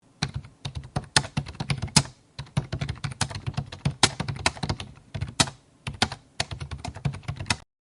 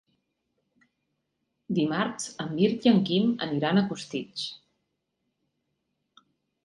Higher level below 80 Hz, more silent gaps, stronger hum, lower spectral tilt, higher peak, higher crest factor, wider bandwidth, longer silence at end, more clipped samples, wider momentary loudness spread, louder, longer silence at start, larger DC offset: first, -46 dBFS vs -68 dBFS; neither; neither; second, -3 dB/octave vs -5.5 dB/octave; first, 0 dBFS vs -10 dBFS; first, 30 dB vs 20 dB; about the same, 12 kHz vs 11.5 kHz; second, 0.25 s vs 2.1 s; neither; about the same, 14 LU vs 12 LU; about the same, -28 LUFS vs -27 LUFS; second, 0.2 s vs 1.7 s; neither